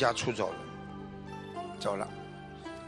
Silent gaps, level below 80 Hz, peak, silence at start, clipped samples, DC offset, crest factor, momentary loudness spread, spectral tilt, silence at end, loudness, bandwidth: none; -60 dBFS; -14 dBFS; 0 s; under 0.1%; under 0.1%; 22 dB; 13 LU; -4.5 dB/octave; 0 s; -37 LUFS; 11.5 kHz